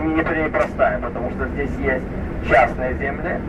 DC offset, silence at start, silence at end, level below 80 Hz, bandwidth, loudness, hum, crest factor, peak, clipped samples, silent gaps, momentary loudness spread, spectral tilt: under 0.1%; 0 s; 0 s; -32 dBFS; 11.5 kHz; -21 LUFS; none; 18 dB; -4 dBFS; under 0.1%; none; 9 LU; -8 dB/octave